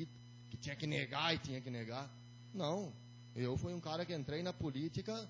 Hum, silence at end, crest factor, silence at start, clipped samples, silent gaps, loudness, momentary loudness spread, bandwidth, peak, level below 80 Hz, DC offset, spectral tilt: 60 Hz at -55 dBFS; 0 s; 22 dB; 0 s; under 0.1%; none; -42 LUFS; 15 LU; 7.6 kHz; -20 dBFS; -64 dBFS; under 0.1%; -5.5 dB/octave